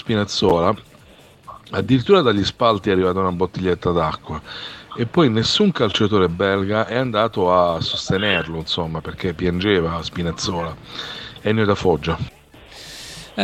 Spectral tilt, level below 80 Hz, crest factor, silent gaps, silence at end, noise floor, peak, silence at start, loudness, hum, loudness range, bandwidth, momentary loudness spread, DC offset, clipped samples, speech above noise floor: -5.5 dB/octave; -44 dBFS; 18 dB; none; 0 s; -47 dBFS; -2 dBFS; 0.05 s; -19 LUFS; none; 4 LU; 13.5 kHz; 14 LU; under 0.1%; under 0.1%; 28 dB